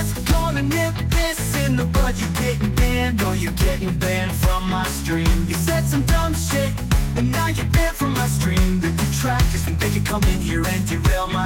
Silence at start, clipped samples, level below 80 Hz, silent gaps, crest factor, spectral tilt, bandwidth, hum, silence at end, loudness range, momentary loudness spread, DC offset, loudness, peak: 0 s; under 0.1%; -24 dBFS; none; 14 dB; -5 dB/octave; 17 kHz; none; 0 s; 1 LU; 2 LU; under 0.1%; -20 LUFS; -6 dBFS